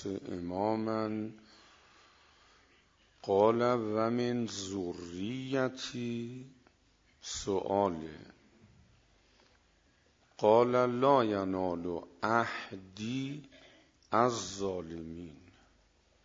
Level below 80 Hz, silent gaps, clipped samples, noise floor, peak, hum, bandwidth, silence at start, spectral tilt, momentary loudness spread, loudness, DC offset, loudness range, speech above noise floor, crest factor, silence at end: -66 dBFS; none; under 0.1%; -68 dBFS; -12 dBFS; none; 7.8 kHz; 0 s; -5.5 dB/octave; 18 LU; -32 LUFS; under 0.1%; 8 LU; 36 dB; 22 dB; 0.9 s